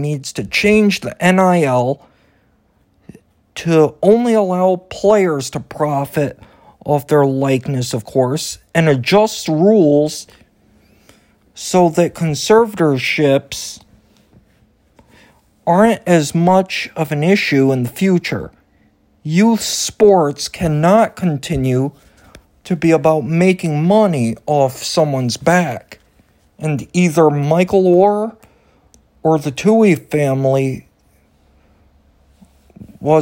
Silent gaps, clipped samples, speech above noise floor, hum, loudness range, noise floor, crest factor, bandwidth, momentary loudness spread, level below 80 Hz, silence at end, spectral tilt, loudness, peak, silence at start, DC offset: none; under 0.1%; 43 dB; none; 3 LU; -57 dBFS; 16 dB; 16.5 kHz; 10 LU; -48 dBFS; 0 s; -6 dB/octave; -15 LUFS; 0 dBFS; 0 s; under 0.1%